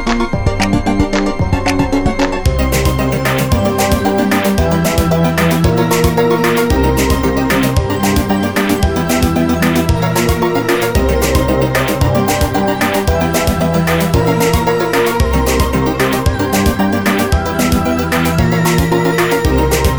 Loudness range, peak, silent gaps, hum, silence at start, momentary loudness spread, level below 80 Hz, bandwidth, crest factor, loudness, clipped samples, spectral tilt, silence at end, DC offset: 1 LU; 0 dBFS; none; none; 0 s; 2 LU; -22 dBFS; over 20 kHz; 12 dB; -13 LUFS; under 0.1%; -5.5 dB/octave; 0 s; under 0.1%